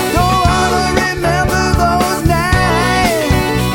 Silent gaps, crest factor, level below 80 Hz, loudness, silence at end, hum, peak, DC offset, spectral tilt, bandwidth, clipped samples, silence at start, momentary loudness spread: none; 12 dB; -22 dBFS; -13 LUFS; 0 s; none; 0 dBFS; under 0.1%; -5 dB/octave; 17 kHz; under 0.1%; 0 s; 2 LU